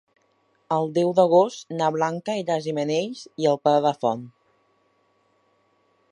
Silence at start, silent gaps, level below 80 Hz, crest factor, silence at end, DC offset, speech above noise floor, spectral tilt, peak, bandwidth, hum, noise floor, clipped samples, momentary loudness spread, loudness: 0.7 s; none; -76 dBFS; 20 dB; 1.85 s; under 0.1%; 44 dB; -6 dB/octave; -4 dBFS; 10.5 kHz; none; -66 dBFS; under 0.1%; 9 LU; -23 LUFS